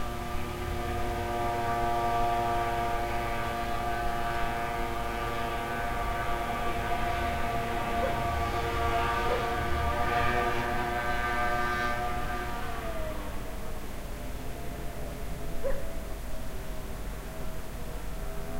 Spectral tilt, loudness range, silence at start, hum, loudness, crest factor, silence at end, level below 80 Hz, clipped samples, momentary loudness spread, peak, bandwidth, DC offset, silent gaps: -5 dB/octave; 10 LU; 0 s; none; -32 LUFS; 16 dB; 0 s; -38 dBFS; under 0.1%; 12 LU; -14 dBFS; 16 kHz; under 0.1%; none